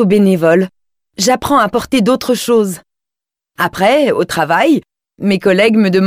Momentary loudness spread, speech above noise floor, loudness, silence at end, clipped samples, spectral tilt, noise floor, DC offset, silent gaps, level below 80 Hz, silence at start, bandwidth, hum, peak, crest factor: 8 LU; 74 dB; -13 LUFS; 0 s; under 0.1%; -5 dB/octave; -85 dBFS; under 0.1%; none; -48 dBFS; 0 s; 16.5 kHz; none; -2 dBFS; 12 dB